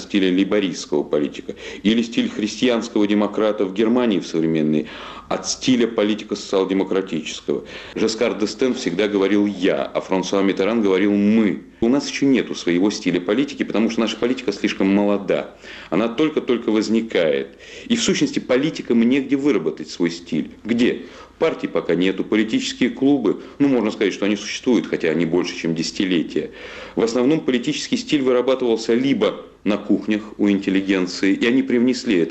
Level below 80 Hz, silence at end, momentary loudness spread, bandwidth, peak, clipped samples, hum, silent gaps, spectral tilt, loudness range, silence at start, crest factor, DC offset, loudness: -56 dBFS; 0 s; 7 LU; 8.6 kHz; -8 dBFS; under 0.1%; none; none; -5 dB/octave; 2 LU; 0 s; 12 dB; under 0.1%; -20 LUFS